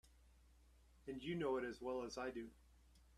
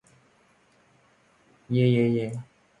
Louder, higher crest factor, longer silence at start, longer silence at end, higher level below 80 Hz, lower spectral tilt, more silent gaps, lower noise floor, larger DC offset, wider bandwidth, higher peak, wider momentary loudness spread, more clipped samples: second, -46 LUFS vs -25 LUFS; about the same, 18 dB vs 18 dB; second, 0.05 s vs 1.7 s; second, 0 s vs 0.35 s; about the same, -68 dBFS vs -66 dBFS; second, -5.5 dB/octave vs -8.5 dB/octave; neither; first, -69 dBFS vs -62 dBFS; neither; first, 13.5 kHz vs 9.6 kHz; second, -30 dBFS vs -10 dBFS; about the same, 13 LU vs 14 LU; neither